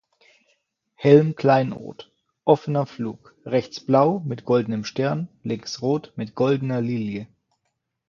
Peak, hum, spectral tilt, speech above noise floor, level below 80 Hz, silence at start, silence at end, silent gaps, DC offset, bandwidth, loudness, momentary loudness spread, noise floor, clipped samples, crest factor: 0 dBFS; none; -7.5 dB/octave; 55 dB; -64 dBFS; 1 s; 0.85 s; none; under 0.1%; 7.2 kHz; -22 LUFS; 15 LU; -77 dBFS; under 0.1%; 22 dB